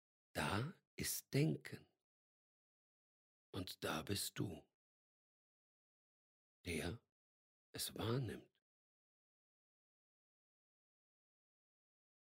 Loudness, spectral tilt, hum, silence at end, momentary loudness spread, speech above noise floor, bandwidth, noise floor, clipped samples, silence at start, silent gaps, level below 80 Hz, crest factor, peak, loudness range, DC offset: -44 LUFS; -4.5 dB/octave; none; 3.95 s; 16 LU; over 47 dB; 16 kHz; under -90 dBFS; under 0.1%; 0.35 s; 0.87-0.98 s, 2.03-3.53 s, 4.74-6.64 s, 7.12-7.74 s; -72 dBFS; 24 dB; -26 dBFS; 6 LU; under 0.1%